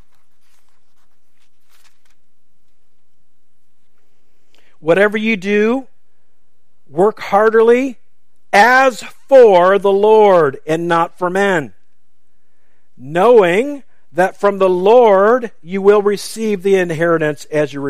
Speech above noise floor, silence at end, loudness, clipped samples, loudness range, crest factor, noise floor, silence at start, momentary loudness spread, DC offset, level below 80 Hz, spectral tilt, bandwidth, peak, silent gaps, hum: 57 dB; 0 s; -13 LUFS; under 0.1%; 8 LU; 14 dB; -69 dBFS; 4.85 s; 12 LU; 2%; -60 dBFS; -5.5 dB/octave; 14.5 kHz; 0 dBFS; none; none